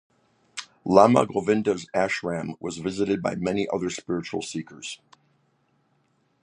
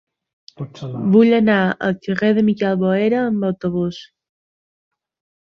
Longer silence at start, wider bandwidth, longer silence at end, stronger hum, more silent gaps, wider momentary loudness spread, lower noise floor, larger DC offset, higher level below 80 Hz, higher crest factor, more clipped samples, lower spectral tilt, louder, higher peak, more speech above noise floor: about the same, 0.55 s vs 0.6 s; first, 10.5 kHz vs 6.4 kHz; about the same, 1.45 s vs 1.45 s; neither; neither; first, 19 LU vs 16 LU; second, -68 dBFS vs under -90 dBFS; neither; about the same, -60 dBFS vs -58 dBFS; first, 24 dB vs 16 dB; neither; second, -5.5 dB/octave vs -8 dB/octave; second, -24 LUFS vs -17 LUFS; about the same, -2 dBFS vs -2 dBFS; second, 44 dB vs over 73 dB